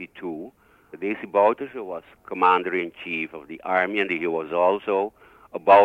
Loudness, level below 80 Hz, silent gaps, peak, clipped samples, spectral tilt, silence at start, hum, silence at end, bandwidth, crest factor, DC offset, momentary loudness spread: -24 LUFS; -68 dBFS; none; -4 dBFS; under 0.1%; -6.5 dB/octave; 0 s; none; 0 s; 6.4 kHz; 20 dB; under 0.1%; 16 LU